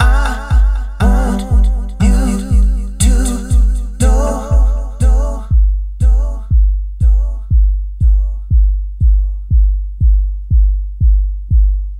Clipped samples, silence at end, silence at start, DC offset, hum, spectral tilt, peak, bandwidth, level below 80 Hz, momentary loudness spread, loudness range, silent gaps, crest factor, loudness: under 0.1%; 0 s; 0 s; under 0.1%; none; -6.5 dB/octave; 0 dBFS; 11 kHz; -12 dBFS; 4 LU; 1 LU; none; 12 dB; -15 LUFS